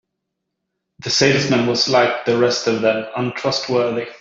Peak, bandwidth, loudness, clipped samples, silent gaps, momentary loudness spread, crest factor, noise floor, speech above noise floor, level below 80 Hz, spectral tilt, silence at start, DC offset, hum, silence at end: -2 dBFS; 7.8 kHz; -17 LUFS; under 0.1%; none; 7 LU; 16 dB; -77 dBFS; 60 dB; -58 dBFS; -4 dB/octave; 1 s; under 0.1%; none; 0.05 s